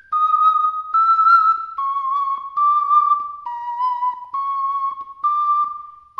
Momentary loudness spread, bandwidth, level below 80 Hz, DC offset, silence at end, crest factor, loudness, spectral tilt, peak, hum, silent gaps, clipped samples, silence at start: 12 LU; 5.8 kHz; -68 dBFS; under 0.1%; 0.25 s; 14 dB; -18 LUFS; -1 dB/octave; -4 dBFS; none; none; under 0.1%; 0.1 s